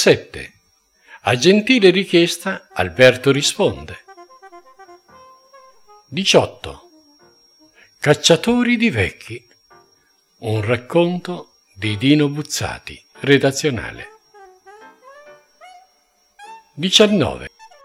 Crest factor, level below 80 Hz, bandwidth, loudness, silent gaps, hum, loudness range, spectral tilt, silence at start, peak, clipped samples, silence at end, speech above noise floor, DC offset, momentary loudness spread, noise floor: 20 dB; -50 dBFS; 17 kHz; -16 LUFS; none; none; 8 LU; -4.5 dB/octave; 0 s; 0 dBFS; under 0.1%; 0.35 s; 44 dB; under 0.1%; 22 LU; -60 dBFS